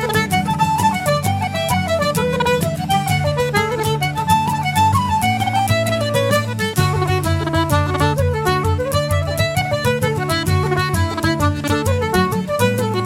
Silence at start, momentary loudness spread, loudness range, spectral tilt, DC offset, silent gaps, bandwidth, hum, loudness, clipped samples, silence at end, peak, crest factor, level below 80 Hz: 0 s; 2 LU; 1 LU; -5 dB/octave; under 0.1%; none; 17 kHz; none; -18 LUFS; under 0.1%; 0 s; -2 dBFS; 16 dB; -38 dBFS